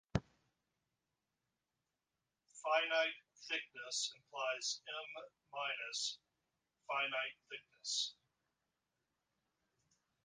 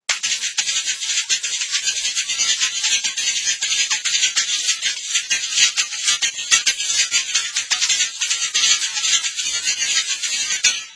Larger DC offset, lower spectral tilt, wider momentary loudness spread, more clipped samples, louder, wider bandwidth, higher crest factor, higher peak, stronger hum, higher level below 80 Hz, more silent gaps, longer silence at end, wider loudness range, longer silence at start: neither; first, -2 dB/octave vs 4.5 dB/octave; first, 15 LU vs 4 LU; neither; second, -40 LUFS vs -17 LUFS; about the same, 10 kHz vs 11 kHz; first, 26 dB vs 20 dB; second, -18 dBFS vs 0 dBFS; neither; second, -68 dBFS vs -62 dBFS; neither; first, 2.15 s vs 0 s; about the same, 4 LU vs 2 LU; about the same, 0.15 s vs 0.1 s